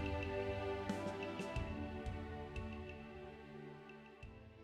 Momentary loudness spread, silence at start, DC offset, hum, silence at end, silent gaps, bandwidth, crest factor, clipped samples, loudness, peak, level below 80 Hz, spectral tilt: 14 LU; 0 s; under 0.1%; none; 0 s; none; 13 kHz; 16 dB; under 0.1%; -46 LUFS; -30 dBFS; -54 dBFS; -6.5 dB/octave